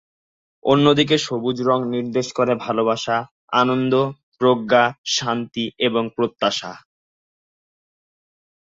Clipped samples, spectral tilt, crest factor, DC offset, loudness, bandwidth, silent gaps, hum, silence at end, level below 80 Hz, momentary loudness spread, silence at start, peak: under 0.1%; -4.5 dB/octave; 18 dB; under 0.1%; -20 LUFS; 7.8 kHz; 3.31-3.48 s, 4.23-4.32 s, 4.98-5.04 s; none; 1.85 s; -62 dBFS; 8 LU; 0.65 s; -2 dBFS